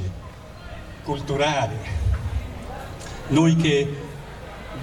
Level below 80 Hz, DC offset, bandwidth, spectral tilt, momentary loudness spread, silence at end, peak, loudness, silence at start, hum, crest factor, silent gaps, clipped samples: -34 dBFS; under 0.1%; 12.5 kHz; -6 dB/octave; 20 LU; 0 s; -8 dBFS; -23 LUFS; 0 s; none; 18 dB; none; under 0.1%